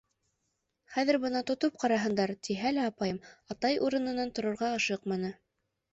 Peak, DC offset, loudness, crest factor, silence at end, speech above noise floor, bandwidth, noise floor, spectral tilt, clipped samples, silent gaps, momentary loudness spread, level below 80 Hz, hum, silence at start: -14 dBFS; under 0.1%; -31 LUFS; 18 dB; 0.6 s; 50 dB; 8.2 kHz; -81 dBFS; -5 dB/octave; under 0.1%; none; 7 LU; -68 dBFS; none; 0.9 s